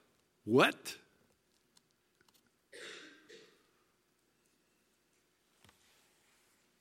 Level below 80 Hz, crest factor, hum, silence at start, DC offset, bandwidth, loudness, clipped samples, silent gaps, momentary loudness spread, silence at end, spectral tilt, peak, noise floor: -90 dBFS; 30 dB; none; 0.45 s; under 0.1%; 16.5 kHz; -31 LUFS; under 0.1%; none; 29 LU; 3.8 s; -4.5 dB/octave; -12 dBFS; -76 dBFS